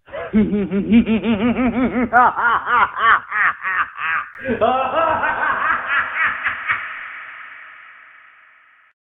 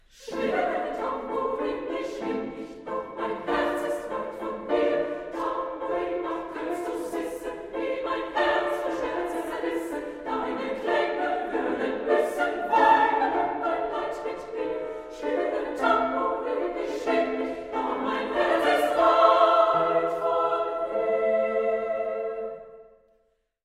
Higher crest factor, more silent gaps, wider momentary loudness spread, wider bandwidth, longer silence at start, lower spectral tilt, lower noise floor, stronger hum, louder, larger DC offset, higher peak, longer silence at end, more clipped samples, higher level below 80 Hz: about the same, 18 dB vs 22 dB; neither; about the same, 14 LU vs 12 LU; second, 3.9 kHz vs 15.5 kHz; about the same, 0.1 s vs 0.2 s; first, -9 dB/octave vs -4.5 dB/octave; second, -51 dBFS vs -69 dBFS; neither; first, -17 LUFS vs -26 LUFS; neither; first, 0 dBFS vs -6 dBFS; first, 1.2 s vs 0.8 s; neither; first, -46 dBFS vs -58 dBFS